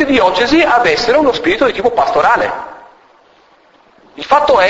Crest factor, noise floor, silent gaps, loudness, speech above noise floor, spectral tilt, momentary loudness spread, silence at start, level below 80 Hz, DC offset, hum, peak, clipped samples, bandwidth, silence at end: 12 dB; -48 dBFS; none; -11 LUFS; 37 dB; -4 dB/octave; 9 LU; 0 s; -42 dBFS; under 0.1%; none; 0 dBFS; under 0.1%; 8 kHz; 0 s